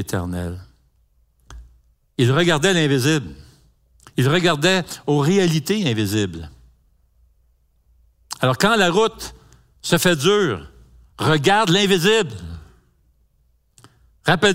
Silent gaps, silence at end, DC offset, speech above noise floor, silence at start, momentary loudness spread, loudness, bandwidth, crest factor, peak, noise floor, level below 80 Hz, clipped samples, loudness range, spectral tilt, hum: none; 0 s; under 0.1%; 44 dB; 0 s; 19 LU; -18 LUFS; 16 kHz; 20 dB; 0 dBFS; -62 dBFS; -50 dBFS; under 0.1%; 4 LU; -4.5 dB/octave; none